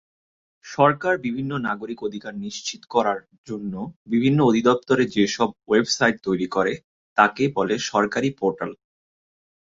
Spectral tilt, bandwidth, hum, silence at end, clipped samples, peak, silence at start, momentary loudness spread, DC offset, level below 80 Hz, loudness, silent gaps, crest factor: -5 dB/octave; 7.8 kHz; none; 0.9 s; under 0.1%; -2 dBFS; 0.65 s; 13 LU; under 0.1%; -60 dBFS; -22 LUFS; 3.38-3.44 s, 3.96-4.06 s, 6.84-7.16 s; 20 dB